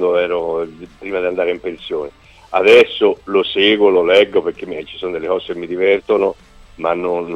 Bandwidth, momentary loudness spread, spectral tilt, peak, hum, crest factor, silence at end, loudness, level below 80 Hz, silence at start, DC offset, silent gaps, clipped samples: 9.4 kHz; 15 LU; -5 dB/octave; 0 dBFS; none; 16 dB; 0 s; -16 LUFS; -50 dBFS; 0 s; under 0.1%; none; under 0.1%